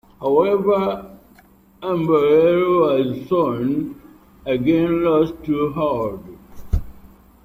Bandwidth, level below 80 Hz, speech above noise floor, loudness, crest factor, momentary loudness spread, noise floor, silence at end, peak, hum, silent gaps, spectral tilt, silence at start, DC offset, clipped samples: 15.5 kHz; -36 dBFS; 33 dB; -19 LUFS; 16 dB; 12 LU; -51 dBFS; 0.4 s; -4 dBFS; none; none; -8.5 dB/octave; 0.2 s; under 0.1%; under 0.1%